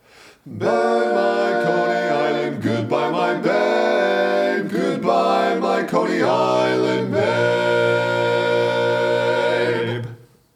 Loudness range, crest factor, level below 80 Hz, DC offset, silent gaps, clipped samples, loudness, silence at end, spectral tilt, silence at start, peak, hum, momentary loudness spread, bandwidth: 1 LU; 16 dB; -70 dBFS; under 0.1%; none; under 0.1%; -19 LUFS; 0.4 s; -6 dB/octave; 0.45 s; -4 dBFS; none; 4 LU; 15 kHz